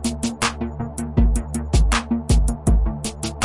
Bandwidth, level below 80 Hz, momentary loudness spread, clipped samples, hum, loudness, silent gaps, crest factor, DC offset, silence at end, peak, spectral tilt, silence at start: 11.5 kHz; -22 dBFS; 8 LU; under 0.1%; none; -22 LUFS; none; 16 dB; under 0.1%; 0 s; -4 dBFS; -5 dB/octave; 0 s